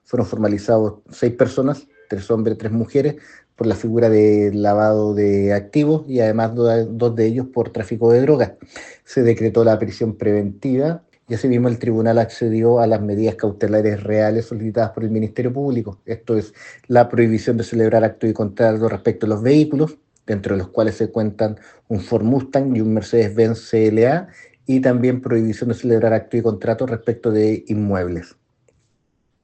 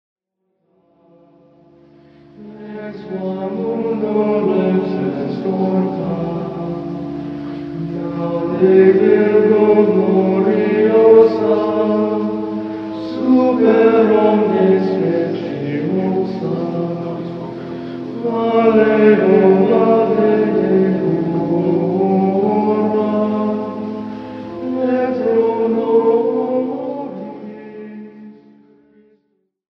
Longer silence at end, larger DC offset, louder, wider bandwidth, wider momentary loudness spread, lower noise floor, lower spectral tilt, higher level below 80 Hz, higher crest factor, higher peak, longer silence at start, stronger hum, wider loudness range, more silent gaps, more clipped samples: second, 1.2 s vs 1.5 s; neither; second, -18 LUFS vs -15 LUFS; first, 8.6 kHz vs 5.8 kHz; second, 8 LU vs 16 LU; about the same, -66 dBFS vs -69 dBFS; second, -8.5 dB/octave vs -10 dB/octave; about the same, -56 dBFS vs -54 dBFS; about the same, 16 dB vs 16 dB; about the same, 0 dBFS vs 0 dBFS; second, 0.15 s vs 2.4 s; neither; second, 3 LU vs 9 LU; neither; neither